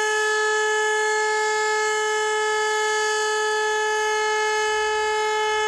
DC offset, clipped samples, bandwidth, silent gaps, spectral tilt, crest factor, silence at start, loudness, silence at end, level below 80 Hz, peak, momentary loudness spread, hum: under 0.1%; under 0.1%; 12.5 kHz; none; 1.5 dB/octave; 10 dB; 0 s; -21 LUFS; 0 s; -62 dBFS; -12 dBFS; 1 LU; none